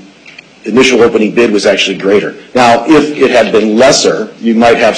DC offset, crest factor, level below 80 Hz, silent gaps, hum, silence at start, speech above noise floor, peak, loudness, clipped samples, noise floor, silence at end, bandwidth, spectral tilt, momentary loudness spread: under 0.1%; 8 dB; -44 dBFS; none; none; 0.65 s; 27 dB; 0 dBFS; -8 LUFS; 0.1%; -35 dBFS; 0 s; 11.5 kHz; -3.5 dB/octave; 7 LU